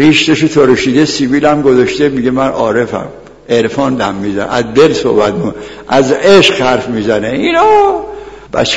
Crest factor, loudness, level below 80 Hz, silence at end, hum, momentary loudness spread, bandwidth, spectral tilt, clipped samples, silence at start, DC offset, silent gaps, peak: 10 dB; -10 LUFS; -40 dBFS; 0 s; none; 11 LU; 11 kHz; -5 dB/octave; 0.5%; 0 s; 0.6%; none; 0 dBFS